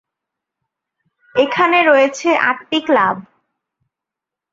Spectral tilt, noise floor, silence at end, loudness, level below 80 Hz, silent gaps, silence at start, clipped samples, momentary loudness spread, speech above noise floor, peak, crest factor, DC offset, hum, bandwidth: -3.5 dB/octave; -85 dBFS; 1.3 s; -14 LUFS; -66 dBFS; none; 1.35 s; under 0.1%; 8 LU; 71 dB; 0 dBFS; 16 dB; under 0.1%; none; 7.8 kHz